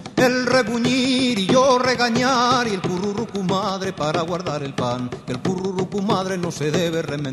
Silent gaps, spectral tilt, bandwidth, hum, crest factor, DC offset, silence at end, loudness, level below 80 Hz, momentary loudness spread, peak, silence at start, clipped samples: none; -4.5 dB/octave; 13 kHz; none; 16 dB; under 0.1%; 0 s; -20 LUFS; -52 dBFS; 8 LU; -4 dBFS; 0 s; under 0.1%